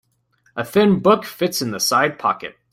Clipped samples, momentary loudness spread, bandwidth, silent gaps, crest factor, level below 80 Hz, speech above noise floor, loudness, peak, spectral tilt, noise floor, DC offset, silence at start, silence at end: under 0.1%; 12 LU; 16.5 kHz; none; 18 dB; -60 dBFS; 44 dB; -18 LUFS; -2 dBFS; -4.5 dB/octave; -62 dBFS; under 0.1%; 0.55 s; 0.2 s